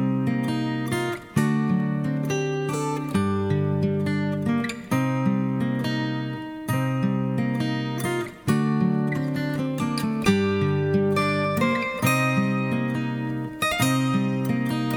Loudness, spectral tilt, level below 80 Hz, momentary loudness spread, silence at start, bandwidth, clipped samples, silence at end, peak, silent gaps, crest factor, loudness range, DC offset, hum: -24 LUFS; -6.5 dB/octave; -56 dBFS; 5 LU; 0 s; over 20 kHz; under 0.1%; 0 s; -6 dBFS; none; 18 dB; 3 LU; under 0.1%; none